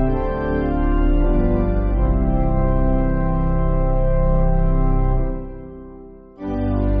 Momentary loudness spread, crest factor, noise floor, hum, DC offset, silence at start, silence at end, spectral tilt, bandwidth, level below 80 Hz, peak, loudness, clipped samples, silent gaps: 13 LU; 10 dB; -39 dBFS; none; under 0.1%; 0 s; 0 s; -9.5 dB/octave; 3.3 kHz; -20 dBFS; -6 dBFS; -21 LUFS; under 0.1%; none